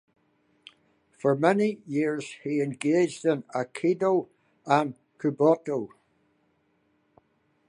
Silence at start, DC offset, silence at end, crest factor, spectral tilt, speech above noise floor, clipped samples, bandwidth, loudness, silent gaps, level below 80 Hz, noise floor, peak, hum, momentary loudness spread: 1.25 s; under 0.1%; 1.8 s; 22 dB; -6.5 dB/octave; 44 dB; under 0.1%; 11 kHz; -26 LUFS; none; -78 dBFS; -70 dBFS; -6 dBFS; none; 10 LU